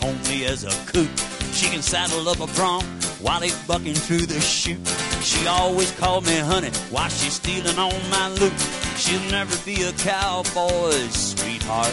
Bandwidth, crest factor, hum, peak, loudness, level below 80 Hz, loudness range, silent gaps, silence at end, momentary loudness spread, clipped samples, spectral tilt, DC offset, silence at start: 12 kHz; 16 dB; none; -6 dBFS; -21 LUFS; -38 dBFS; 1 LU; none; 0 s; 4 LU; under 0.1%; -2.5 dB/octave; under 0.1%; 0 s